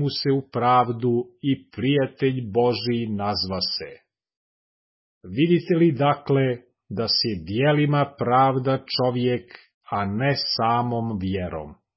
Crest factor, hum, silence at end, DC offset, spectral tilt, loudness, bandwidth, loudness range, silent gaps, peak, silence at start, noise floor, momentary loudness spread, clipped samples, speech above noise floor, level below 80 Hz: 16 dB; none; 0.25 s; under 0.1%; -9.5 dB/octave; -23 LUFS; 5.8 kHz; 4 LU; 4.37-5.21 s, 9.74-9.81 s; -6 dBFS; 0 s; under -90 dBFS; 9 LU; under 0.1%; over 68 dB; -52 dBFS